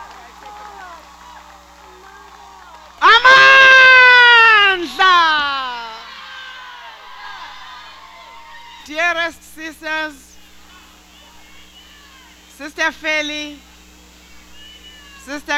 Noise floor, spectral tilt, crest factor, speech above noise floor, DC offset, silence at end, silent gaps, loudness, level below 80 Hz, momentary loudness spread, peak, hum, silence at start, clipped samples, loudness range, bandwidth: -44 dBFS; -0.5 dB/octave; 16 dB; 21 dB; under 0.1%; 0 s; none; -10 LUFS; -50 dBFS; 28 LU; 0 dBFS; none; 0 s; under 0.1%; 20 LU; 15.5 kHz